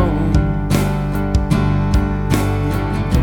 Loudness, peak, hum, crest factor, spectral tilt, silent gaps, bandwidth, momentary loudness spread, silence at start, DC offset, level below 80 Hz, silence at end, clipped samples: -18 LUFS; -2 dBFS; none; 14 dB; -7 dB/octave; none; 19 kHz; 3 LU; 0 s; under 0.1%; -22 dBFS; 0 s; under 0.1%